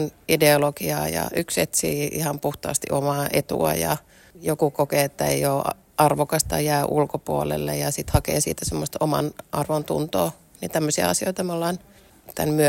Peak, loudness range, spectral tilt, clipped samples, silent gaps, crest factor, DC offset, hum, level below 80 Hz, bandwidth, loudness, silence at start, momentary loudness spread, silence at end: -2 dBFS; 2 LU; -4.5 dB/octave; under 0.1%; none; 22 dB; under 0.1%; none; -44 dBFS; 16.5 kHz; -23 LUFS; 0 s; 7 LU; 0 s